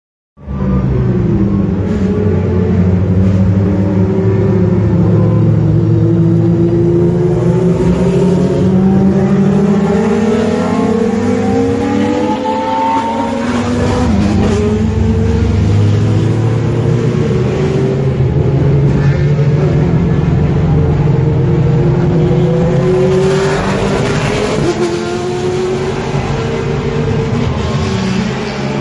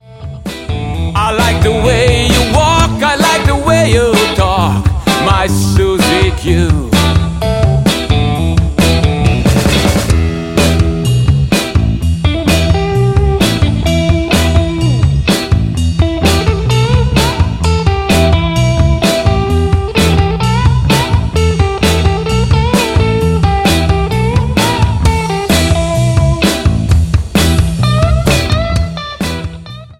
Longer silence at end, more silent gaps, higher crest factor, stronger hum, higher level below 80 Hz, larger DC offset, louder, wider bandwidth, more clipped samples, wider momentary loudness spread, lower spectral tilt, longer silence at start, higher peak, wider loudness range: about the same, 0 s vs 0.05 s; neither; about the same, 10 dB vs 10 dB; neither; second, -26 dBFS vs -18 dBFS; neither; about the same, -12 LUFS vs -11 LUFS; second, 11 kHz vs 16.5 kHz; neither; about the same, 5 LU vs 4 LU; first, -8 dB/octave vs -5.5 dB/octave; first, 0.4 s vs 0.1 s; about the same, 0 dBFS vs 0 dBFS; about the same, 3 LU vs 2 LU